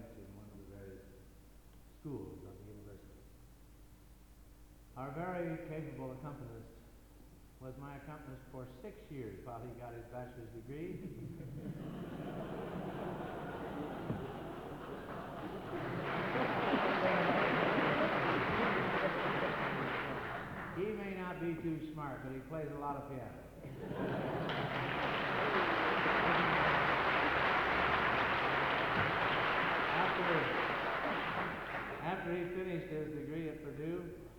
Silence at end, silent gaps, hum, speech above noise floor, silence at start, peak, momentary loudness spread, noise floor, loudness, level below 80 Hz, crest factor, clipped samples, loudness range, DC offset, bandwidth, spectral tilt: 0 s; none; none; 17 dB; 0 s; -18 dBFS; 19 LU; -59 dBFS; -36 LUFS; -60 dBFS; 20 dB; under 0.1%; 18 LU; under 0.1%; 19.5 kHz; -6.5 dB/octave